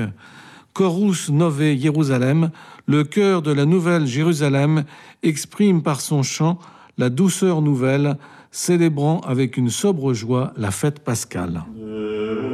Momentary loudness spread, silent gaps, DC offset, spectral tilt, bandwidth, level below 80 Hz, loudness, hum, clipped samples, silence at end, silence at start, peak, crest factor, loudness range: 10 LU; none; under 0.1%; -6 dB/octave; 14.5 kHz; -58 dBFS; -20 LUFS; none; under 0.1%; 0 s; 0 s; -6 dBFS; 12 dB; 2 LU